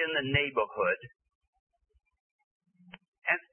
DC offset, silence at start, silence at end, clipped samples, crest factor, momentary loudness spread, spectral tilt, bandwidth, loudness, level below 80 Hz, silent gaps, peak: under 0.1%; 0 s; 0.1 s; under 0.1%; 22 dB; 8 LU; -8.5 dB/octave; 3.4 kHz; -30 LUFS; -62 dBFS; 1.35-1.41 s, 1.48-1.53 s, 1.59-1.67 s, 2.20-2.60 s, 3.08-3.13 s; -12 dBFS